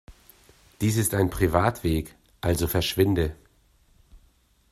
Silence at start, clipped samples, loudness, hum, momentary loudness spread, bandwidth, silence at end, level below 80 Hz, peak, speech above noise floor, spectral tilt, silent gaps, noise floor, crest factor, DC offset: 0.1 s; under 0.1%; -25 LUFS; none; 8 LU; 15.5 kHz; 0.55 s; -42 dBFS; -4 dBFS; 38 dB; -5.5 dB/octave; none; -62 dBFS; 22 dB; under 0.1%